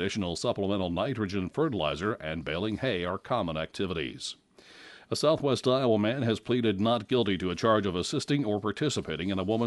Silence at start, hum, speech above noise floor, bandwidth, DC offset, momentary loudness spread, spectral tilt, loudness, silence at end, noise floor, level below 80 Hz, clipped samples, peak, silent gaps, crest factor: 0 s; none; 24 dB; 11.5 kHz; under 0.1%; 7 LU; -5.5 dB/octave; -29 LUFS; 0 s; -53 dBFS; -56 dBFS; under 0.1%; -12 dBFS; none; 18 dB